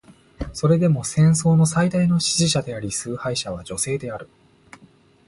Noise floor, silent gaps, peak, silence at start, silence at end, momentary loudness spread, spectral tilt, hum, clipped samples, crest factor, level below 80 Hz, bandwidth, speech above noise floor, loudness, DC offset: -53 dBFS; none; -6 dBFS; 0.4 s; 1.05 s; 12 LU; -5 dB/octave; none; under 0.1%; 16 dB; -46 dBFS; 11.5 kHz; 33 dB; -20 LUFS; under 0.1%